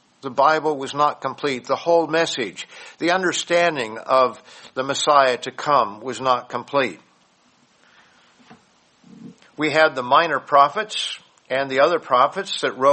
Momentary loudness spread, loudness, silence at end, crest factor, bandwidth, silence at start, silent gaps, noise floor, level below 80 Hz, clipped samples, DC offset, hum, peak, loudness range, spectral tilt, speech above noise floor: 11 LU; -20 LUFS; 0 s; 20 dB; 8.8 kHz; 0.25 s; none; -59 dBFS; -70 dBFS; under 0.1%; under 0.1%; none; 0 dBFS; 8 LU; -3 dB/octave; 39 dB